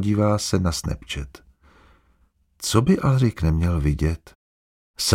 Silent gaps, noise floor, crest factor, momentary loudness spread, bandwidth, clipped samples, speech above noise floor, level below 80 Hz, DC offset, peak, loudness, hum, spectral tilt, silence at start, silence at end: 4.35-4.94 s; -62 dBFS; 22 dB; 13 LU; 16.5 kHz; under 0.1%; 41 dB; -34 dBFS; under 0.1%; -2 dBFS; -22 LUFS; none; -5.5 dB/octave; 0 s; 0 s